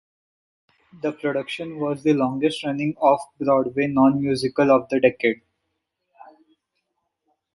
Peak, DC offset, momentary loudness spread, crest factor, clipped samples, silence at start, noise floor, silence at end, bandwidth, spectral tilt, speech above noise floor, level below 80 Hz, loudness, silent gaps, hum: -4 dBFS; under 0.1%; 9 LU; 20 dB; under 0.1%; 0.95 s; -77 dBFS; 2.2 s; 11.5 kHz; -6.5 dB/octave; 56 dB; -62 dBFS; -21 LUFS; none; none